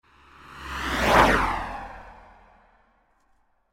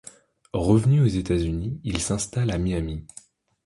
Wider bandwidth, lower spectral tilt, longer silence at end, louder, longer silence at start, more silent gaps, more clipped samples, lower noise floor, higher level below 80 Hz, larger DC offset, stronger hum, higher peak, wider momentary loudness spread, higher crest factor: first, 16.5 kHz vs 11.5 kHz; second, -4.5 dB/octave vs -6.5 dB/octave; first, 1.6 s vs 0.6 s; about the same, -22 LUFS vs -24 LUFS; about the same, 0.5 s vs 0.55 s; neither; neither; first, -65 dBFS vs -51 dBFS; about the same, -40 dBFS vs -38 dBFS; neither; neither; about the same, -4 dBFS vs -6 dBFS; first, 25 LU vs 13 LU; first, 24 dB vs 18 dB